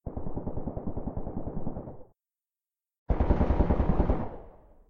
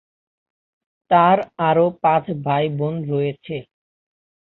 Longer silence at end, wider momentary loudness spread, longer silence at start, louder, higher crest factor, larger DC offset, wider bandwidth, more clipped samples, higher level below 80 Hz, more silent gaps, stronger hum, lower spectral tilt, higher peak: second, 0.4 s vs 0.8 s; about the same, 14 LU vs 12 LU; second, 0.05 s vs 1.1 s; second, -31 LUFS vs -19 LUFS; about the same, 18 dB vs 18 dB; neither; about the same, 4.6 kHz vs 4.2 kHz; neither; first, -32 dBFS vs -62 dBFS; first, 2.98-3.06 s vs none; neither; about the same, -11 dB/octave vs -10 dB/octave; second, -12 dBFS vs -2 dBFS